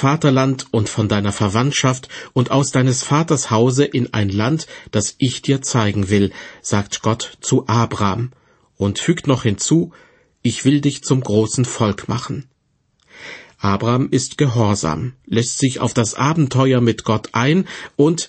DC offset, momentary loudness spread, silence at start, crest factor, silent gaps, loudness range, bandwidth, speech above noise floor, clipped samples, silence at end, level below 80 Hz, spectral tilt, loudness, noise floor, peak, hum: under 0.1%; 8 LU; 0 s; 16 dB; none; 3 LU; 8.8 kHz; 47 dB; under 0.1%; 0 s; -50 dBFS; -5.5 dB/octave; -18 LUFS; -64 dBFS; -2 dBFS; none